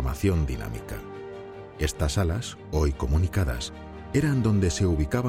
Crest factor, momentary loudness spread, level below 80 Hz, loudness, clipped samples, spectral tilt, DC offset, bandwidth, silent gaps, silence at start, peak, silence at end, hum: 16 dB; 16 LU; -34 dBFS; -27 LUFS; under 0.1%; -6 dB/octave; under 0.1%; 16.5 kHz; none; 0 s; -10 dBFS; 0 s; none